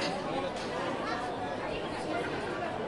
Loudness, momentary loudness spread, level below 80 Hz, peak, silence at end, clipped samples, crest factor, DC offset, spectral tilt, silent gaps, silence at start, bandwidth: -34 LUFS; 2 LU; -58 dBFS; -18 dBFS; 0 s; under 0.1%; 16 dB; under 0.1%; -5 dB/octave; none; 0 s; 11.5 kHz